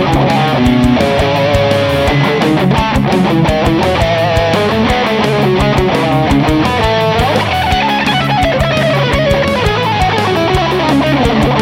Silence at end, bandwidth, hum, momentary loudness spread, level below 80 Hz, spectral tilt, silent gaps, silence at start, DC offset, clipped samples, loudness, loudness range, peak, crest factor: 0 s; 17 kHz; none; 1 LU; -24 dBFS; -6 dB/octave; none; 0 s; under 0.1%; under 0.1%; -11 LUFS; 1 LU; 0 dBFS; 10 dB